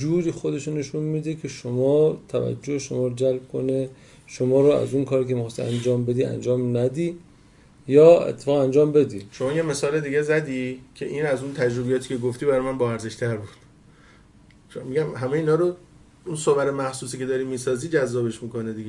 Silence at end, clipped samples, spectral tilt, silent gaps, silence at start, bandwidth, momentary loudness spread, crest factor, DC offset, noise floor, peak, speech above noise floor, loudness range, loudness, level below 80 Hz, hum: 0 s; under 0.1%; -6.5 dB/octave; none; 0 s; 11.5 kHz; 12 LU; 20 dB; under 0.1%; -52 dBFS; -2 dBFS; 30 dB; 7 LU; -23 LUFS; -58 dBFS; none